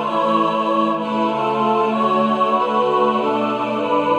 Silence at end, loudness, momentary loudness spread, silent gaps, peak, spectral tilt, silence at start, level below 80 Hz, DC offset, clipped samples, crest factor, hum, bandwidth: 0 s; -18 LUFS; 3 LU; none; -6 dBFS; -6.5 dB/octave; 0 s; -72 dBFS; under 0.1%; under 0.1%; 12 dB; none; 9.8 kHz